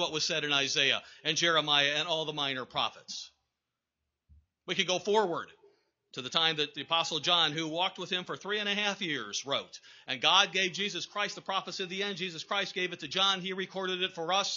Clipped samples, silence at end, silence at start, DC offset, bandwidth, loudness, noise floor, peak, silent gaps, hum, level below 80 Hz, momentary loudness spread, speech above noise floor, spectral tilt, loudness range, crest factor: under 0.1%; 0 s; 0 s; under 0.1%; 7.6 kHz; -29 LUFS; -87 dBFS; -8 dBFS; none; none; -76 dBFS; 11 LU; 56 dB; 0 dB/octave; 5 LU; 24 dB